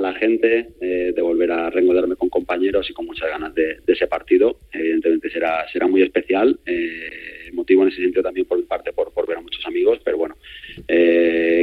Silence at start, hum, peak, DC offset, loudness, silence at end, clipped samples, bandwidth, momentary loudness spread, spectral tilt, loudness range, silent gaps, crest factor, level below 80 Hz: 0 s; none; -2 dBFS; under 0.1%; -19 LUFS; 0 s; under 0.1%; 4.7 kHz; 10 LU; -6.5 dB/octave; 2 LU; none; 18 dB; -50 dBFS